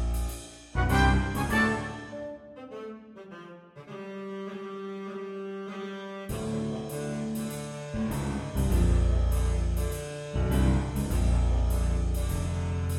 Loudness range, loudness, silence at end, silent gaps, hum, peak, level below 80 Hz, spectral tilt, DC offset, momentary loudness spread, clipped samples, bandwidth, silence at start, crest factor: 12 LU; -30 LUFS; 0 s; none; none; -10 dBFS; -32 dBFS; -6 dB/octave; under 0.1%; 17 LU; under 0.1%; 16 kHz; 0 s; 18 dB